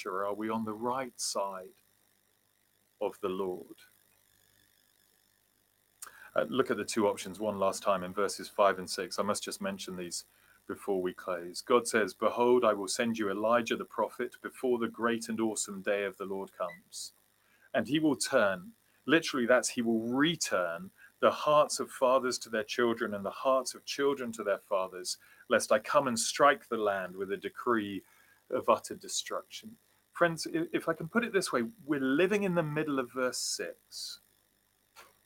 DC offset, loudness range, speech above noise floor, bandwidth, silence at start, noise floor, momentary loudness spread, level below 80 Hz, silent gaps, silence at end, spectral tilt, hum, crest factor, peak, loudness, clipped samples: under 0.1%; 8 LU; 41 dB; 17 kHz; 0 s; -72 dBFS; 12 LU; -76 dBFS; none; 0.2 s; -3.5 dB/octave; none; 22 dB; -12 dBFS; -32 LUFS; under 0.1%